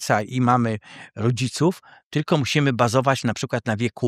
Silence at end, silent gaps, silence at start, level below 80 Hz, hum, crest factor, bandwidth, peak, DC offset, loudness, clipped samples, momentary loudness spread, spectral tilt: 0 s; 2.05-2.11 s; 0 s; -60 dBFS; none; 20 dB; 14.5 kHz; -2 dBFS; under 0.1%; -22 LUFS; under 0.1%; 9 LU; -5.5 dB/octave